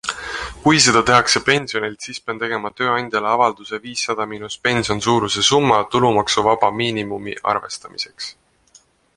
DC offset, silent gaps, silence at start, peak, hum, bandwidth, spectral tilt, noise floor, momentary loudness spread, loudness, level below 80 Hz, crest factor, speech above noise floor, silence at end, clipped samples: under 0.1%; none; 0.05 s; 0 dBFS; none; 11.5 kHz; -3 dB/octave; -53 dBFS; 14 LU; -18 LUFS; -48 dBFS; 20 dB; 35 dB; 0.85 s; under 0.1%